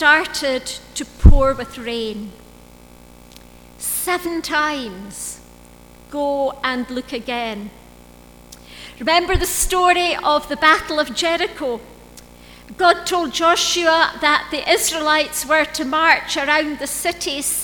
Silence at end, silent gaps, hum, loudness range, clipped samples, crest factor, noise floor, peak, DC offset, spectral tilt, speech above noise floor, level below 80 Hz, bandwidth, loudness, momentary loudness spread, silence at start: 0 s; none; 60 Hz at -50 dBFS; 9 LU; under 0.1%; 18 dB; -44 dBFS; 0 dBFS; under 0.1%; -3 dB/octave; 26 dB; -26 dBFS; over 20 kHz; -18 LUFS; 15 LU; 0 s